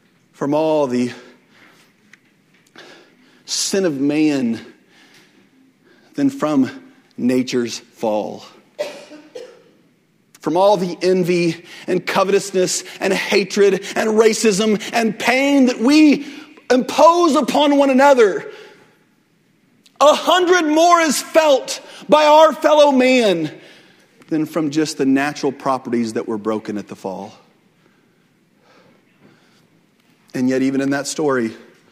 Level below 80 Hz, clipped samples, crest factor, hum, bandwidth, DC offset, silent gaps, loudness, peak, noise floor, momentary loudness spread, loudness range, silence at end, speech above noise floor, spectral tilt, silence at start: -66 dBFS; under 0.1%; 18 dB; none; 16 kHz; under 0.1%; none; -16 LUFS; 0 dBFS; -59 dBFS; 17 LU; 11 LU; 0.35 s; 43 dB; -4 dB/octave; 0.4 s